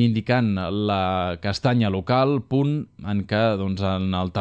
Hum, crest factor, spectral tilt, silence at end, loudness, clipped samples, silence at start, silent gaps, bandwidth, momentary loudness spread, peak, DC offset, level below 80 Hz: none; 16 dB; -7.5 dB/octave; 0 s; -23 LUFS; under 0.1%; 0 s; none; 8.6 kHz; 5 LU; -6 dBFS; under 0.1%; -52 dBFS